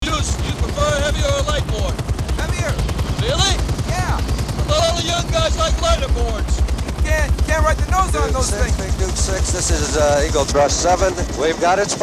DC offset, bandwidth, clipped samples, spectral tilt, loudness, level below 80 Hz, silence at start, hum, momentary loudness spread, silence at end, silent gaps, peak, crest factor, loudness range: 0.4%; 14.5 kHz; under 0.1%; -4 dB/octave; -18 LUFS; -22 dBFS; 0 s; none; 6 LU; 0 s; none; -2 dBFS; 14 dB; 2 LU